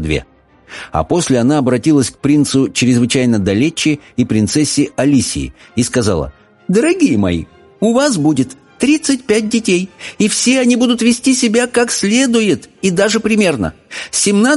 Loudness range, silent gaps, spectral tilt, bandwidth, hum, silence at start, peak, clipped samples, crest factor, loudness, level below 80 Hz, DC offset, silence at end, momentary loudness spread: 2 LU; none; -4.5 dB/octave; 11.5 kHz; none; 0 s; 0 dBFS; under 0.1%; 14 dB; -14 LUFS; -38 dBFS; under 0.1%; 0 s; 8 LU